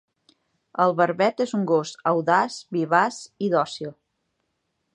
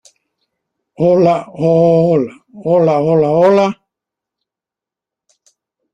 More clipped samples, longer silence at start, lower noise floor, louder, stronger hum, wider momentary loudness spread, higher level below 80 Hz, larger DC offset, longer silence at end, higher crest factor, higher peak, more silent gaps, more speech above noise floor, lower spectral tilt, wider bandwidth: neither; second, 0.75 s vs 1 s; second, -76 dBFS vs -87 dBFS; second, -23 LUFS vs -12 LUFS; neither; about the same, 9 LU vs 8 LU; second, -76 dBFS vs -56 dBFS; neither; second, 1.05 s vs 2.2 s; first, 20 dB vs 14 dB; about the same, -4 dBFS vs -2 dBFS; neither; second, 53 dB vs 75 dB; second, -5.5 dB/octave vs -8.5 dB/octave; first, 10.5 kHz vs 9.4 kHz